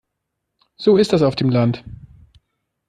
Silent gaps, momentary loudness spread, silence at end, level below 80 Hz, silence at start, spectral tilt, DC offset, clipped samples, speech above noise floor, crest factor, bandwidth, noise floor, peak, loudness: none; 7 LU; 0.95 s; -50 dBFS; 0.8 s; -7.5 dB/octave; under 0.1%; under 0.1%; 61 dB; 16 dB; 11 kHz; -77 dBFS; -4 dBFS; -17 LUFS